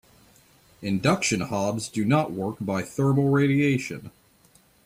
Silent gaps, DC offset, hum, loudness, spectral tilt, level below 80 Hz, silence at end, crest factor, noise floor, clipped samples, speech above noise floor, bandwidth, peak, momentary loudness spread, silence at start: none; under 0.1%; none; -24 LUFS; -5.5 dB/octave; -60 dBFS; 0.75 s; 18 dB; -59 dBFS; under 0.1%; 35 dB; 15.5 kHz; -8 dBFS; 9 LU; 0.8 s